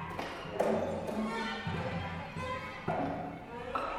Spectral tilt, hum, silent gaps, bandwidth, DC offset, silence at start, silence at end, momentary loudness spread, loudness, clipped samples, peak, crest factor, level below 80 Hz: -6 dB/octave; none; none; 16.5 kHz; under 0.1%; 0 s; 0 s; 7 LU; -37 LUFS; under 0.1%; -18 dBFS; 18 dB; -58 dBFS